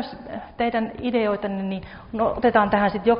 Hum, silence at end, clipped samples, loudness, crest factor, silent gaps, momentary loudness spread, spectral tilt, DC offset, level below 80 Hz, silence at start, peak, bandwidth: none; 0 s; under 0.1%; -23 LUFS; 18 dB; none; 14 LU; -4.5 dB/octave; under 0.1%; -48 dBFS; 0 s; -4 dBFS; 5.4 kHz